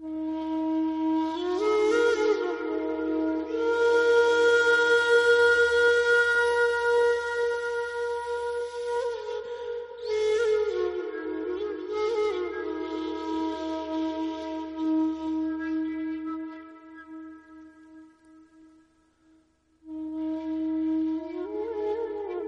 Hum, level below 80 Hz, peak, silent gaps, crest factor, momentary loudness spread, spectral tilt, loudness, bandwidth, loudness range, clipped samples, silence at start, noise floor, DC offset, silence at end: none; -60 dBFS; -10 dBFS; none; 16 dB; 14 LU; -3.5 dB/octave; -26 LUFS; 10.5 kHz; 14 LU; under 0.1%; 0 s; -64 dBFS; under 0.1%; 0 s